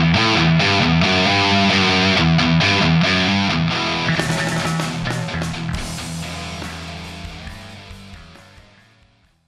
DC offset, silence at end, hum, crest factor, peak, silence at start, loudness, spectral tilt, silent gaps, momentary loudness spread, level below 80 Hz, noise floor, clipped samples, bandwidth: under 0.1%; 1.05 s; none; 16 dB; -2 dBFS; 0 s; -17 LUFS; -5 dB/octave; none; 18 LU; -38 dBFS; -56 dBFS; under 0.1%; 13 kHz